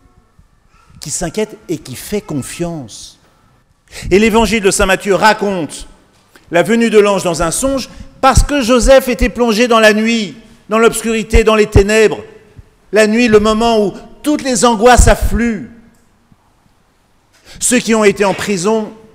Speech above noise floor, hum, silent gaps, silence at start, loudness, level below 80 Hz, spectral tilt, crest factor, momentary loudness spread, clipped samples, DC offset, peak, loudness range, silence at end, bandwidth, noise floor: 42 dB; none; none; 1.05 s; -12 LUFS; -24 dBFS; -4 dB/octave; 12 dB; 14 LU; 0.4%; under 0.1%; 0 dBFS; 6 LU; 0.2 s; 16.5 kHz; -53 dBFS